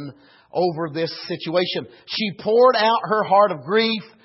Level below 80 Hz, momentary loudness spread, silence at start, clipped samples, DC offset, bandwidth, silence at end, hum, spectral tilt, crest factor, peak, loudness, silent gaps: -70 dBFS; 13 LU; 0 s; under 0.1%; under 0.1%; 5.8 kHz; 0.15 s; none; -8 dB/octave; 16 dB; -4 dBFS; -20 LUFS; none